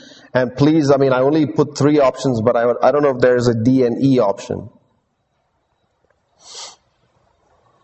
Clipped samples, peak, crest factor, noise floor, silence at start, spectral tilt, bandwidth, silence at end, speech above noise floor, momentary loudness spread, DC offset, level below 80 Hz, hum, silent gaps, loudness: under 0.1%; 0 dBFS; 16 dB; -67 dBFS; 0.35 s; -7 dB/octave; 8.4 kHz; 1.15 s; 52 dB; 15 LU; under 0.1%; -52 dBFS; none; none; -15 LUFS